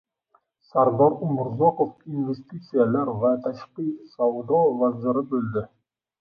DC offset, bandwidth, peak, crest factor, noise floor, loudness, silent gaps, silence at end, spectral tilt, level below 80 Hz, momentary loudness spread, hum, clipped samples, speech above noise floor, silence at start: under 0.1%; 5.2 kHz; -6 dBFS; 18 dB; -66 dBFS; -24 LUFS; none; 0.55 s; -11 dB/octave; -64 dBFS; 11 LU; none; under 0.1%; 43 dB; 0.75 s